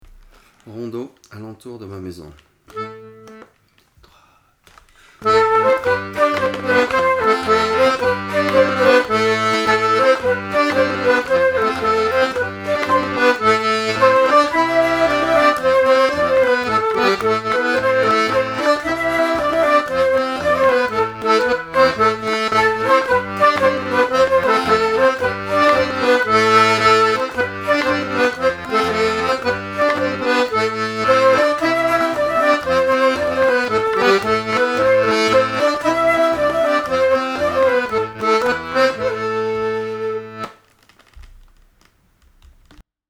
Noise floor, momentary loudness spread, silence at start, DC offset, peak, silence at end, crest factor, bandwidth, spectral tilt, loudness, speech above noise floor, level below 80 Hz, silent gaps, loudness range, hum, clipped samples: -57 dBFS; 7 LU; 0.65 s; under 0.1%; 0 dBFS; 0.3 s; 16 dB; 15 kHz; -4.5 dB/octave; -16 LUFS; 26 dB; -48 dBFS; none; 7 LU; none; under 0.1%